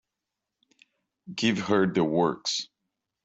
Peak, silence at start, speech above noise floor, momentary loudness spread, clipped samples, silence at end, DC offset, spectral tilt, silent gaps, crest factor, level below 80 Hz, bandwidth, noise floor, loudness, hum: -10 dBFS; 1.25 s; 60 dB; 11 LU; under 0.1%; 0.6 s; under 0.1%; -4.5 dB/octave; none; 20 dB; -68 dBFS; 8.2 kHz; -86 dBFS; -26 LUFS; none